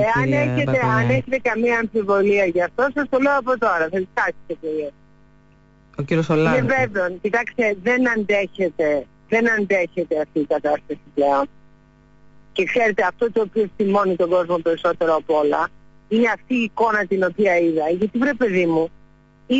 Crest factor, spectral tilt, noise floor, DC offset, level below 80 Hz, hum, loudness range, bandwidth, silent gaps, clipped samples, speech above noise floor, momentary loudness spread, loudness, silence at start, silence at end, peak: 12 dB; -7 dB/octave; -52 dBFS; under 0.1%; -52 dBFS; none; 3 LU; 7.8 kHz; none; under 0.1%; 33 dB; 6 LU; -20 LUFS; 0 s; 0 s; -8 dBFS